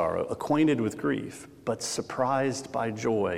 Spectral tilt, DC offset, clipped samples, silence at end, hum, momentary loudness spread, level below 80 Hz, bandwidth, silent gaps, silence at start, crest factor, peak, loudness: -5 dB/octave; under 0.1%; under 0.1%; 0 s; none; 9 LU; -64 dBFS; 15.5 kHz; none; 0 s; 16 dB; -12 dBFS; -29 LUFS